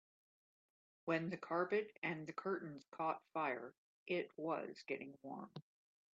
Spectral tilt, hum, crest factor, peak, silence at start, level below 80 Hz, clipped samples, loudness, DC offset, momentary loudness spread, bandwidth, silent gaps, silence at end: -4.5 dB/octave; none; 20 dB; -24 dBFS; 1.05 s; under -90 dBFS; under 0.1%; -44 LUFS; under 0.1%; 12 LU; 7.6 kHz; 1.98-2.02 s, 2.88-2.92 s, 3.77-4.06 s; 0.5 s